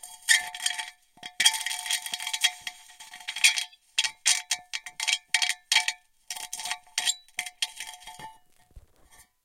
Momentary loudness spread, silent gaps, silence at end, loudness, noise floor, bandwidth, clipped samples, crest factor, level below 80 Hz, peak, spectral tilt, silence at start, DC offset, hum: 20 LU; none; 0.2 s; -26 LUFS; -58 dBFS; 16.5 kHz; under 0.1%; 28 dB; -66 dBFS; -2 dBFS; 4 dB/octave; 0.05 s; under 0.1%; none